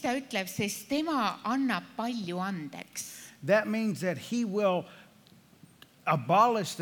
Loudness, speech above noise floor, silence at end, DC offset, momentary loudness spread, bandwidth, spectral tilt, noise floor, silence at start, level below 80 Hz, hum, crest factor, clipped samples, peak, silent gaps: -30 LUFS; 29 dB; 0 s; under 0.1%; 13 LU; 19 kHz; -5 dB/octave; -58 dBFS; 0 s; -78 dBFS; none; 20 dB; under 0.1%; -10 dBFS; none